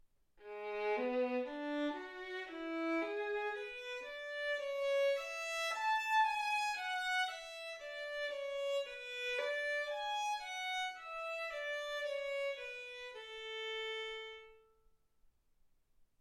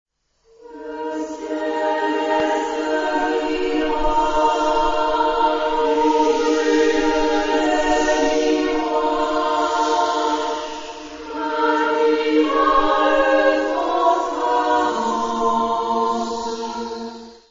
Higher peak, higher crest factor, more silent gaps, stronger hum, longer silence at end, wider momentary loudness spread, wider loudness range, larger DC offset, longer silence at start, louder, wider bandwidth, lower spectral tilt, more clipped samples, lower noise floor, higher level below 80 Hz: second, -24 dBFS vs -4 dBFS; about the same, 16 dB vs 14 dB; neither; neither; about the same, 0.15 s vs 0.15 s; about the same, 11 LU vs 11 LU; first, 7 LU vs 4 LU; neither; second, 0.4 s vs 0.65 s; second, -39 LUFS vs -19 LUFS; first, 16 kHz vs 7.6 kHz; second, -0.5 dB/octave vs -3 dB/octave; neither; first, -72 dBFS vs -58 dBFS; second, -76 dBFS vs -40 dBFS